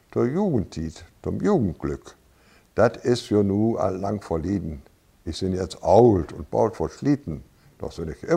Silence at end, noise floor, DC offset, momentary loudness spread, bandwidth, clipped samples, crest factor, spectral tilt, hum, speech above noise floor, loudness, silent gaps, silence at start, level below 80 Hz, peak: 0 s; -56 dBFS; under 0.1%; 17 LU; 11.5 kHz; under 0.1%; 22 dB; -7.5 dB/octave; none; 34 dB; -23 LUFS; none; 0.15 s; -46 dBFS; -2 dBFS